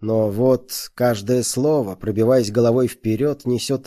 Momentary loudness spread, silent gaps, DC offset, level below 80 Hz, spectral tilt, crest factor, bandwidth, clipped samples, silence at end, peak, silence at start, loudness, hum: 5 LU; none; under 0.1%; -52 dBFS; -6 dB/octave; 14 dB; 14.5 kHz; under 0.1%; 0.05 s; -6 dBFS; 0 s; -19 LUFS; none